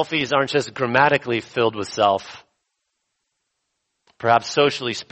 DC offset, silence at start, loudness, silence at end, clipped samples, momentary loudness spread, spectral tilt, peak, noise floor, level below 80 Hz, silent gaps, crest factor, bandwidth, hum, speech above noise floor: under 0.1%; 0 s; -20 LUFS; 0.1 s; under 0.1%; 9 LU; -4.5 dB/octave; -2 dBFS; -76 dBFS; -62 dBFS; none; 20 dB; 8.4 kHz; none; 56 dB